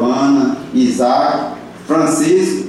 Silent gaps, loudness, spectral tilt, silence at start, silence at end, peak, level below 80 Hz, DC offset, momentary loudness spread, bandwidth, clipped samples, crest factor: none; -14 LUFS; -5 dB/octave; 0 s; 0 s; -4 dBFS; -56 dBFS; under 0.1%; 7 LU; 13 kHz; under 0.1%; 10 dB